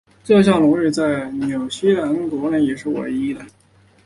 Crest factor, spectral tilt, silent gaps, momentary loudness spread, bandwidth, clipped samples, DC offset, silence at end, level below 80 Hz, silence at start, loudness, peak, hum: 16 dB; -6.5 dB/octave; none; 10 LU; 11.5 kHz; under 0.1%; under 0.1%; 0.55 s; -54 dBFS; 0.25 s; -18 LUFS; -2 dBFS; none